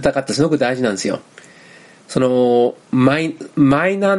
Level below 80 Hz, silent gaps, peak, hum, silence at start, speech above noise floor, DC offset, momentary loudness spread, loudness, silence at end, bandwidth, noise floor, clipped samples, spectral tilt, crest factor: -50 dBFS; none; 0 dBFS; none; 0 s; 28 dB; under 0.1%; 9 LU; -17 LUFS; 0 s; 11.5 kHz; -44 dBFS; under 0.1%; -6 dB/octave; 16 dB